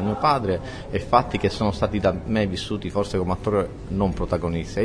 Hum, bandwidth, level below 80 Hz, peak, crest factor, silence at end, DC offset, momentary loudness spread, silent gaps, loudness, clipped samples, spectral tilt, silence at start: none; 10.5 kHz; -38 dBFS; -2 dBFS; 20 dB; 0 s; under 0.1%; 7 LU; none; -24 LUFS; under 0.1%; -6.5 dB/octave; 0 s